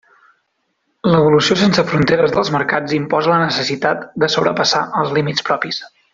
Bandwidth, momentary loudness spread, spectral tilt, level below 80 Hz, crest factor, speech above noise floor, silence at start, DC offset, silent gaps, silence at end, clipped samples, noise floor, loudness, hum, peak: 7.8 kHz; 7 LU; -5 dB/octave; -52 dBFS; 14 dB; 53 dB; 1.05 s; under 0.1%; none; 0.25 s; under 0.1%; -68 dBFS; -15 LUFS; none; -2 dBFS